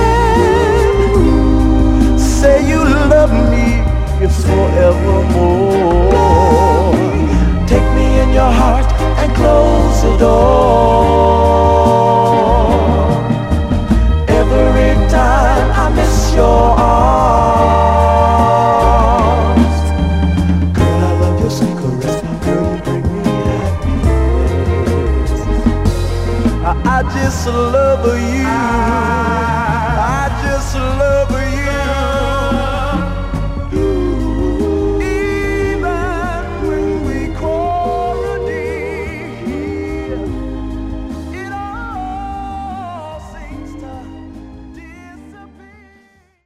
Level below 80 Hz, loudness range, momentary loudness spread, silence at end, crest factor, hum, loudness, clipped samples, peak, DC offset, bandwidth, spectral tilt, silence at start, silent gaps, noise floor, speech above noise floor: -18 dBFS; 12 LU; 13 LU; 1 s; 12 dB; none; -13 LUFS; under 0.1%; 0 dBFS; under 0.1%; 13.5 kHz; -7 dB/octave; 0 s; none; -50 dBFS; 41 dB